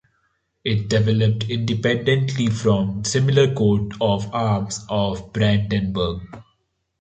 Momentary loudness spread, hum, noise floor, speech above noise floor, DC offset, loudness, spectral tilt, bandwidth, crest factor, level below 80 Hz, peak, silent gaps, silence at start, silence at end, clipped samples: 7 LU; none; -70 dBFS; 50 dB; under 0.1%; -21 LUFS; -6 dB/octave; 9 kHz; 16 dB; -44 dBFS; -4 dBFS; none; 0.65 s; 0.6 s; under 0.1%